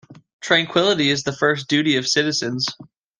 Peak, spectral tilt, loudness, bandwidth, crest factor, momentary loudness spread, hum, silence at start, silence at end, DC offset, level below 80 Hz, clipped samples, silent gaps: -2 dBFS; -3.5 dB/octave; -19 LUFS; 10 kHz; 18 dB; 7 LU; none; 0.1 s; 0.35 s; under 0.1%; -62 dBFS; under 0.1%; 0.33-0.39 s